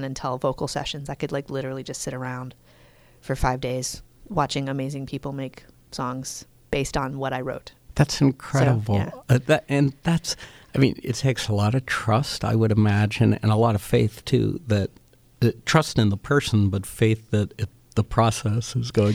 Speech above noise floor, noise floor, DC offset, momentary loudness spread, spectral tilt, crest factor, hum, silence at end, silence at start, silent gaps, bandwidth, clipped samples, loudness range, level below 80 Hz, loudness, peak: 30 dB; -53 dBFS; under 0.1%; 12 LU; -6 dB/octave; 20 dB; none; 0 s; 0 s; none; 15 kHz; under 0.1%; 8 LU; -44 dBFS; -24 LUFS; -4 dBFS